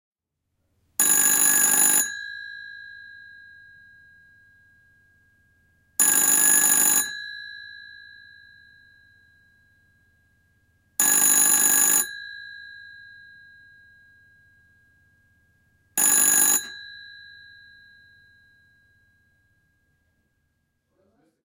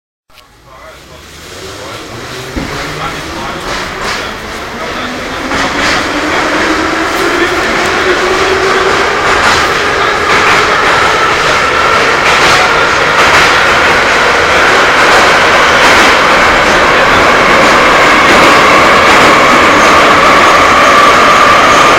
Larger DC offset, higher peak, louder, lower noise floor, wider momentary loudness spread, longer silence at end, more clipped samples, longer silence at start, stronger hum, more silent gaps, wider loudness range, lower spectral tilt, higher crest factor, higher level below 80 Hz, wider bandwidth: neither; second, -4 dBFS vs 0 dBFS; second, -17 LUFS vs -6 LUFS; first, -79 dBFS vs -38 dBFS; first, 25 LU vs 14 LU; first, 4.4 s vs 0 s; second, under 0.1% vs 0.7%; first, 1 s vs 0.7 s; neither; neither; second, 10 LU vs 14 LU; second, 1 dB/octave vs -2.5 dB/octave; first, 22 dB vs 8 dB; second, -70 dBFS vs -30 dBFS; about the same, 17.5 kHz vs 17 kHz